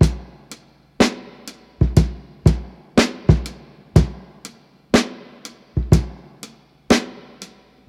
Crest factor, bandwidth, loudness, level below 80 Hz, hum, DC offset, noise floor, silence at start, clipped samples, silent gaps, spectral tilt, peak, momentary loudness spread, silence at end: 20 dB; 14 kHz; -19 LUFS; -28 dBFS; none; under 0.1%; -44 dBFS; 0 s; under 0.1%; none; -6 dB/octave; 0 dBFS; 22 LU; 0.45 s